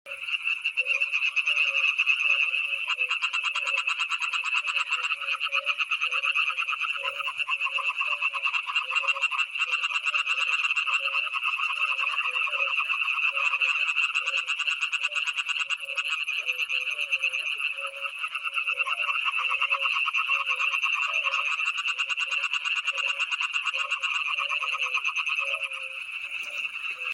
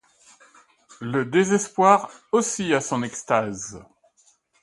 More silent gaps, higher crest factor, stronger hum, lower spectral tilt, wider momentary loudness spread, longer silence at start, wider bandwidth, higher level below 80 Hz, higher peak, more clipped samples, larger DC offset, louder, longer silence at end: neither; second, 16 dB vs 22 dB; neither; second, 4 dB/octave vs -4.5 dB/octave; second, 5 LU vs 14 LU; second, 0.05 s vs 1 s; first, 16 kHz vs 11.5 kHz; second, -84 dBFS vs -64 dBFS; second, -10 dBFS vs -2 dBFS; neither; neither; second, -25 LUFS vs -22 LUFS; second, 0 s vs 0.8 s